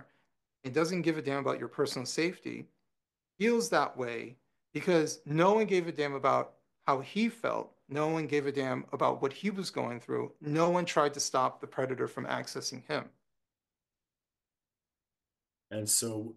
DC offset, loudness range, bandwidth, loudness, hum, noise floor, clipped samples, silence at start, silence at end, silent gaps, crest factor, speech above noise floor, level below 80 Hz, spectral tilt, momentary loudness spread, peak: under 0.1%; 8 LU; 12.5 kHz; -32 LUFS; none; under -90 dBFS; under 0.1%; 0 s; 0.05 s; none; 22 dB; over 59 dB; -80 dBFS; -4.5 dB/octave; 10 LU; -12 dBFS